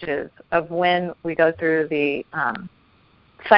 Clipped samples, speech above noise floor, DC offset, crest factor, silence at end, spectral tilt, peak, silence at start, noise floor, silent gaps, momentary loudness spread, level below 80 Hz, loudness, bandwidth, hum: under 0.1%; 34 dB; under 0.1%; 22 dB; 0 s; -9.5 dB/octave; 0 dBFS; 0 s; -57 dBFS; none; 11 LU; -58 dBFS; -22 LUFS; 5.6 kHz; none